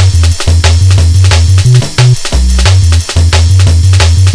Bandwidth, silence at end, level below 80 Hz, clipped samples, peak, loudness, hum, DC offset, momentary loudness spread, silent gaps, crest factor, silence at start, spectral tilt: 11 kHz; 0 s; -12 dBFS; 1%; 0 dBFS; -7 LUFS; none; under 0.1%; 3 LU; none; 4 dB; 0 s; -4.5 dB/octave